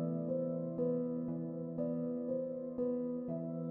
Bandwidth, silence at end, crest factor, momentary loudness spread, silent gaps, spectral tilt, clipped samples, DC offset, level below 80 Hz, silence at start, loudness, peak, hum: 2.1 kHz; 0 s; 14 dB; 4 LU; none; -13.5 dB/octave; under 0.1%; under 0.1%; -76 dBFS; 0 s; -38 LUFS; -24 dBFS; none